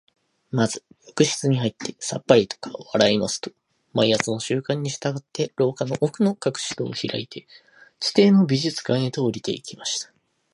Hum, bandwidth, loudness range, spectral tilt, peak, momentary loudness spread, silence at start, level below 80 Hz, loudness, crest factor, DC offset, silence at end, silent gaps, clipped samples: none; 11.5 kHz; 3 LU; -5 dB/octave; 0 dBFS; 12 LU; 0.55 s; -62 dBFS; -23 LUFS; 22 dB; under 0.1%; 0.5 s; none; under 0.1%